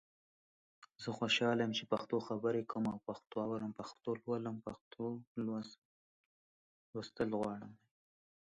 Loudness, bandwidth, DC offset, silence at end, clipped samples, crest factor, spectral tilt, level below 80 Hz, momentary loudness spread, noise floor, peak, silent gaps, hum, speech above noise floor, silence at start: -40 LUFS; 9.4 kHz; under 0.1%; 0.8 s; under 0.1%; 20 dB; -5.5 dB/octave; -76 dBFS; 14 LU; under -90 dBFS; -22 dBFS; 4.81-4.91 s, 5.27-5.35 s, 5.78-6.93 s; none; over 51 dB; 0.8 s